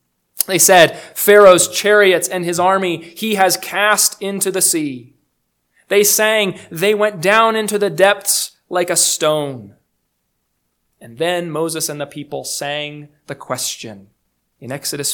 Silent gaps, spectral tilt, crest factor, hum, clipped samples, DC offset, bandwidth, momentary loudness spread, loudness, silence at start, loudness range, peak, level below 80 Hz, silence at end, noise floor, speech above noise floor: none; -2 dB/octave; 16 dB; none; 0.2%; under 0.1%; 19.5 kHz; 16 LU; -14 LUFS; 0.35 s; 12 LU; 0 dBFS; -64 dBFS; 0 s; -69 dBFS; 54 dB